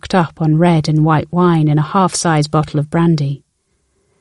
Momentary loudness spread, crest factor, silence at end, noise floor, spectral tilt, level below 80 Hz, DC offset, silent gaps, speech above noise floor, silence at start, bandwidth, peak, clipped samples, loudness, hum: 5 LU; 14 dB; 0.85 s; -64 dBFS; -6.5 dB/octave; -46 dBFS; 0.2%; none; 51 dB; 0.05 s; 11.5 kHz; 0 dBFS; under 0.1%; -14 LUFS; none